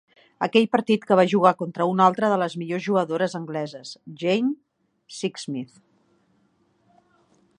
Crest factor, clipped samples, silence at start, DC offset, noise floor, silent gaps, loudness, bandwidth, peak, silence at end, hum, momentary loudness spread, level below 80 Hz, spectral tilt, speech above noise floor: 22 dB; under 0.1%; 0.4 s; under 0.1%; -65 dBFS; none; -23 LUFS; 11 kHz; -2 dBFS; 1.95 s; none; 15 LU; -74 dBFS; -6 dB/octave; 43 dB